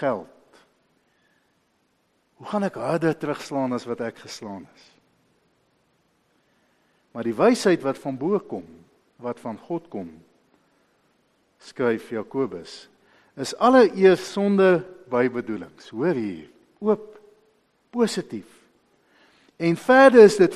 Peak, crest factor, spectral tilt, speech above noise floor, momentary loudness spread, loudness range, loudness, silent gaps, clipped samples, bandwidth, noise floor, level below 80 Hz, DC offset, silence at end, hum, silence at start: 0 dBFS; 22 dB; -6 dB/octave; 47 dB; 21 LU; 12 LU; -21 LUFS; none; under 0.1%; 13 kHz; -68 dBFS; -68 dBFS; under 0.1%; 0 s; none; 0 s